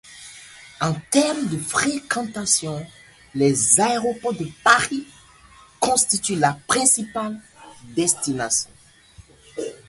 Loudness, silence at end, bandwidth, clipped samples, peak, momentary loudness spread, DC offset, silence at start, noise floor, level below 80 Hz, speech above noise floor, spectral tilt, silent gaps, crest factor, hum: -20 LUFS; 0.15 s; 12 kHz; under 0.1%; 0 dBFS; 17 LU; under 0.1%; 0.05 s; -50 dBFS; -56 dBFS; 29 dB; -2.5 dB/octave; none; 22 dB; none